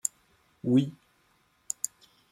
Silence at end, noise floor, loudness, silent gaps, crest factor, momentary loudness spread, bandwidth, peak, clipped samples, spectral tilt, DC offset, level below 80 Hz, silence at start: 1.4 s; -68 dBFS; -30 LUFS; none; 26 dB; 12 LU; 16.5 kHz; -8 dBFS; under 0.1%; -5.5 dB/octave; under 0.1%; -72 dBFS; 0.05 s